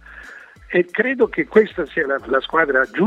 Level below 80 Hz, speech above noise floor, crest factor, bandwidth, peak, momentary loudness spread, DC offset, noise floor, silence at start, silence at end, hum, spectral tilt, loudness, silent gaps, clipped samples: -50 dBFS; 23 dB; 20 dB; 7.2 kHz; 0 dBFS; 14 LU; under 0.1%; -41 dBFS; 0.1 s; 0 s; none; -7 dB/octave; -18 LUFS; none; under 0.1%